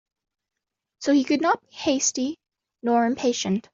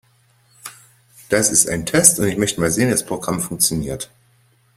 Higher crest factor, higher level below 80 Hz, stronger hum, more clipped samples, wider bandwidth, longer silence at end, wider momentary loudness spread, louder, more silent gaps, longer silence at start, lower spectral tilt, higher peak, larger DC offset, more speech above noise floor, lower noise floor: about the same, 16 dB vs 20 dB; second, -66 dBFS vs -46 dBFS; neither; neither; second, 7.8 kHz vs 16 kHz; second, 0.15 s vs 0.7 s; second, 9 LU vs 23 LU; second, -23 LUFS vs -16 LUFS; neither; first, 1 s vs 0.65 s; about the same, -3.5 dB/octave vs -3 dB/octave; second, -10 dBFS vs 0 dBFS; neither; first, 55 dB vs 39 dB; first, -78 dBFS vs -57 dBFS